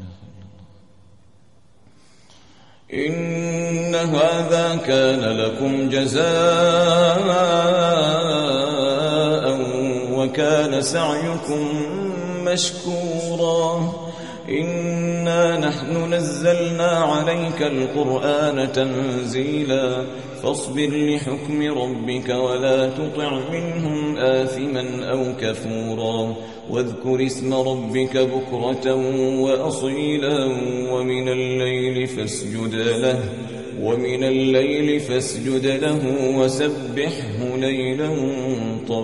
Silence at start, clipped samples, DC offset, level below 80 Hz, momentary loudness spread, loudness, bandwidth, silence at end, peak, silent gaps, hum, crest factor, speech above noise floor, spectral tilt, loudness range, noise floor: 0 s; under 0.1%; 0.3%; -58 dBFS; 8 LU; -21 LUFS; 11.5 kHz; 0 s; -4 dBFS; none; none; 16 dB; 35 dB; -5 dB/octave; 6 LU; -55 dBFS